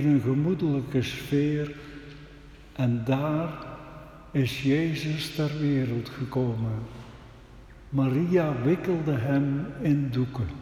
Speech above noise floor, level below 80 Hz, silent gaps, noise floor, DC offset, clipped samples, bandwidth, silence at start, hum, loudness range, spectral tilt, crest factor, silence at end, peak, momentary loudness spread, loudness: 22 dB; -52 dBFS; none; -48 dBFS; under 0.1%; under 0.1%; 15 kHz; 0 s; none; 3 LU; -7.5 dB/octave; 16 dB; 0 s; -12 dBFS; 18 LU; -27 LUFS